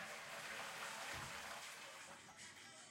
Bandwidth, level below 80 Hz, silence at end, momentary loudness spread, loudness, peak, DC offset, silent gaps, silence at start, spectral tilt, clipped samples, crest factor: 16.5 kHz; -78 dBFS; 0 s; 8 LU; -50 LUFS; -34 dBFS; under 0.1%; none; 0 s; -1 dB/octave; under 0.1%; 18 dB